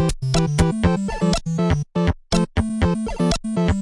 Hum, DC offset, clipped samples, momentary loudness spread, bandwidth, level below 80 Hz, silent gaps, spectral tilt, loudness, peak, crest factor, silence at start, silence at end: none; under 0.1%; under 0.1%; 3 LU; 11.5 kHz; -30 dBFS; none; -6 dB/octave; -21 LUFS; -4 dBFS; 16 dB; 0 s; 0 s